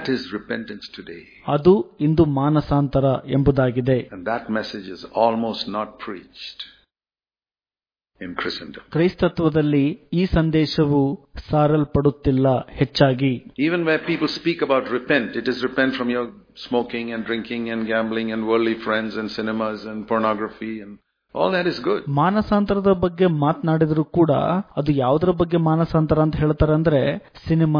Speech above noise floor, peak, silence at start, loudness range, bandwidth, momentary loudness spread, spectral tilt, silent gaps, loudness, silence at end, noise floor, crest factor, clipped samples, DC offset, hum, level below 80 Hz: over 70 dB; -2 dBFS; 0 s; 7 LU; 5.2 kHz; 13 LU; -8.5 dB/octave; none; -21 LUFS; 0 s; under -90 dBFS; 18 dB; under 0.1%; under 0.1%; none; -42 dBFS